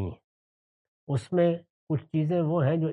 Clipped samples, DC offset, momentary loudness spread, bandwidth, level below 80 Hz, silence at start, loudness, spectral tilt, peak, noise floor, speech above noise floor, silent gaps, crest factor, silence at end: under 0.1%; under 0.1%; 8 LU; 10.5 kHz; -66 dBFS; 0 s; -28 LUFS; -9 dB/octave; -14 dBFS; under -90 dBFS; over 64 dB; 0.24-1.07 s, 1.70-1.87 s; 14 dB; 0 s